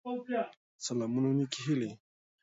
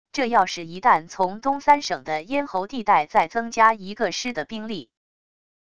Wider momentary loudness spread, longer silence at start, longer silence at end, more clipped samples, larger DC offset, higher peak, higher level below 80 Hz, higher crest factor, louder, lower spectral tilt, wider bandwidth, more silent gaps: about the same, 10 LU vs 10 LU; about the same, 0.05 s vs 0.15 s; second, 0.45 s vs 0.8 s; neither; second, under 0.1% vs 0.5%; second, -18 dBFS vs -4 dBFS; second, -78 dBFS vs -58 dBFS; about the same, 18 dB vs 20 dB; second, -34 LUFS vs -22 LUFS; first, -5.5 dB/octave vs -3.5 dB/octave; second, 8 kHz vs 10 kHz; first, 0.57-0.79 s vs none